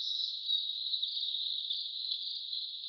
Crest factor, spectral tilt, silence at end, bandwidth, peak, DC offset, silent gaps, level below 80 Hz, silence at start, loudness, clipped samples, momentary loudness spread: 16 dB; 11.5 dB/octave; 0 s; 6.6 kHz; -20 dBFS; under 0.1%; none; under -90 dBFS; 0 s; -33 LUFS; under 0.1%; 4 LU